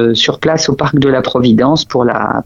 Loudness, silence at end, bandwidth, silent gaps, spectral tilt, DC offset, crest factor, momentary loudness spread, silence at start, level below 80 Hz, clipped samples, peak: -11 LUFS; 0.05 s; 7.6 kHz; none; -5 dB/octave; under 0.1%; 12 dB; 3 LU; 0 s; -40 dBFS; under 0.1%; 0 dBFS